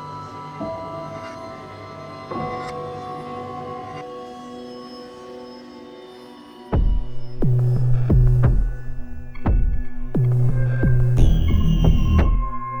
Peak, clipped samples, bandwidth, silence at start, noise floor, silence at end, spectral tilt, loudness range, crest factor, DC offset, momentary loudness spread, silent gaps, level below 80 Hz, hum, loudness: -2 dBFS; under 0.1%; 6.8 kHz; 0 s; -41 dBFS; 0 s; -8.5 dB/octave; 13 LU; 18 dB; under 0.1%; 19 LU; none; -24 dBFS; none; -22 LUFS